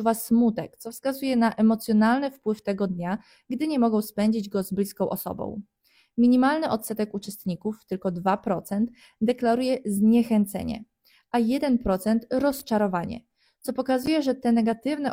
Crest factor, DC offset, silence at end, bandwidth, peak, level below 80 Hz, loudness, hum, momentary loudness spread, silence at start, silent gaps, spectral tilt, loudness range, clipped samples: 16 dB; under 0.1%; 0 s; 16.5 kHz; -8 dBFS; -54 dBFS; -25 LUFS; none; 11 LU; 0 s; none; -6 dB/octave; 3 LU; under 0.1%